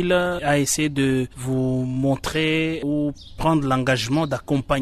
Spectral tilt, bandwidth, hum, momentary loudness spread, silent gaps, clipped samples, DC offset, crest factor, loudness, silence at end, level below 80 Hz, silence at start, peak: -5 dB/octave; 13.5 kHz; none; 5 LU; none; under 0.1%; under 0.1%; 14 dB; -22 LUFS; 0 s; -42 dBFS; 0 s; -8 dBFS